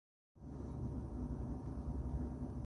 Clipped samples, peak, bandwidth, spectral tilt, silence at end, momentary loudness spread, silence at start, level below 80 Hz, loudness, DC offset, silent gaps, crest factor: under 0.1%; -30 dBFS; 10.5 kHz; -10 dB/octave; 0 s; 6 LU; 0.35 s; -48 dBFS; -45 LUFS; under 0.1%; none; 14 dB